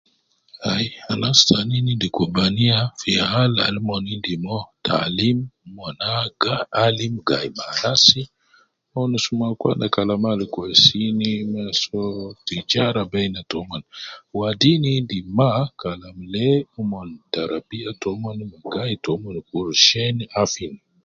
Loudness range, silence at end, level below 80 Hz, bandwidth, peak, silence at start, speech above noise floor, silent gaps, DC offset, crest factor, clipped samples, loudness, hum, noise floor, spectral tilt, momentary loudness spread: 6 LU; 0.3 s; -52 dBFS; 7.8 kHz; 0 dBFS; 0.6 s; 38 dB; none; under 0.1%; 22 dB; under 0.1%; -20 LUFS; none; -58 dBFS; -4.5 dB/octave; 16 LU